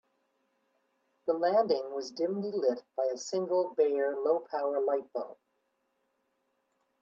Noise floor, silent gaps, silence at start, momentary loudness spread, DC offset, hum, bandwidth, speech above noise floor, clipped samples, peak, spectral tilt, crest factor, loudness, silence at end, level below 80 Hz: -78 dBFS; none; 1.25 s; 9 LU; under 0.1%; none; 7.6 kHz; 48 dB; under 0.1%; -16 dBFS; -5 dB/octave; 18 dB; -31 LUFS; 1.7 s; -84 dBFS